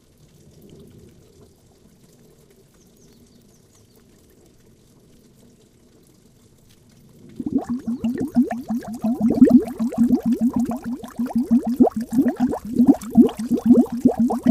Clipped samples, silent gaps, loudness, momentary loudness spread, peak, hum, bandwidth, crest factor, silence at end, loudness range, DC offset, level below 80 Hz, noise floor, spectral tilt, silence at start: under 0.1%; none; -19 LUFS; 11 LU; 0 dBFS; none; 14.5 kHz; 20 dB; 0 s; 12 LU; under 0.1%; -52 dBFS; -53 dBFS; -8 dB/octave; 7.4 s